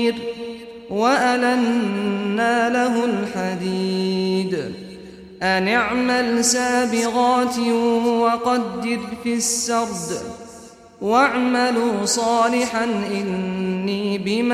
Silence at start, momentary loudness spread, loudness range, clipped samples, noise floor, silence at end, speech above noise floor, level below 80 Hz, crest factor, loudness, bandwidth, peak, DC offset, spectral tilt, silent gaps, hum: 0 s; 11 LU; 3 LU; under 0.1%; -42 dBFS; 0 s; 23 dB; -56 dBFS; 16 dB; -20 LUFS; 15 kHz; -4 dBFS; under 0.1%; -4 dB/octave; none; none